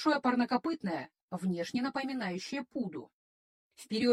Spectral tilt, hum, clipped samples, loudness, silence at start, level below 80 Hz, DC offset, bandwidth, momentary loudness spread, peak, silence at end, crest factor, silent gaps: -5.5 dB/octave; none; under 0.1%; -34 LUFS; 0 s; -74 dBFS; under 0.1%; 12.5 kHz; 11 LU; -16 dBFS; 0 s; 18 dB; 1.22-1.28 s, 3.13-3.70 s